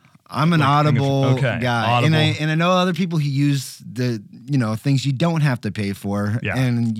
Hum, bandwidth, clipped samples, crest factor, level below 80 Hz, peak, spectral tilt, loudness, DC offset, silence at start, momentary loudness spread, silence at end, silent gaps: none; 14.5 kHz; under 0.1%; 14 dB; -60 dBFS; -6 dBFS; -6.5 dB/octave; -19 LUFS; under 0.1%; 0.3 s; 9 LU; 0 s; none